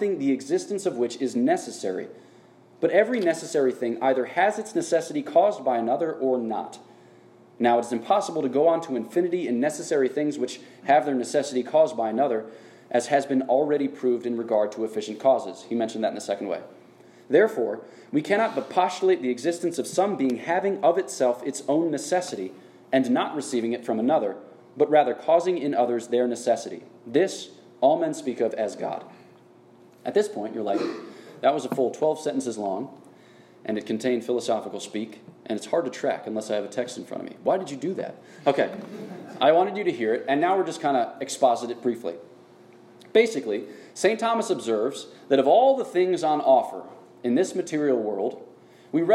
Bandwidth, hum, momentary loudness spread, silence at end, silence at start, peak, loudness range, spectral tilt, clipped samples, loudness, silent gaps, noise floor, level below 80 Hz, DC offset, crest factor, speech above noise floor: 13 kHz; none; 12 LU; 0 s; 0 s; -6 dBFS; 5 LU; -4.5 dB/octave; under 0.1%; -25 LUFS; none; -53 dBFS; -80 dBFS; under 0.1%; 20 dB; 29 dB